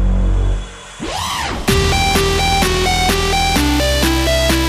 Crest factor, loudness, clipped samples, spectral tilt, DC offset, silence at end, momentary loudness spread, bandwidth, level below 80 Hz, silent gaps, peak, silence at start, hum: 14 dB; -15 LUFS; under 0.1%; -4 dB/octave; under 0.1%; 0 s; 8 LU; 15.5 kHz; -20 dBFS; none; 0 dBFS; 0 s; none